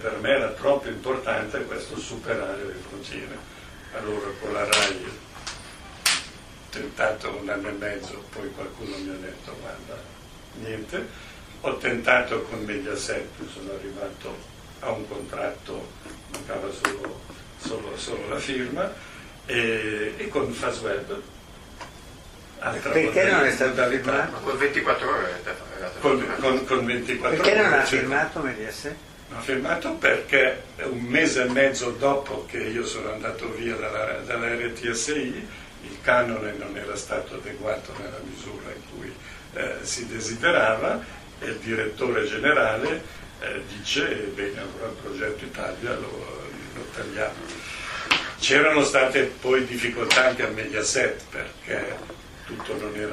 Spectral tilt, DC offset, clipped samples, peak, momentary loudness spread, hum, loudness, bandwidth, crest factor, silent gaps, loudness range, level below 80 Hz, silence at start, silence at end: -3 dB/octave; under 0.1%; under 0.1%; 0 dBFS; 18 LU; none; -25 LUFS; 15.5 kHz; 26 dB; none; 10 LU; -50 dBFS; 0 s; 0 s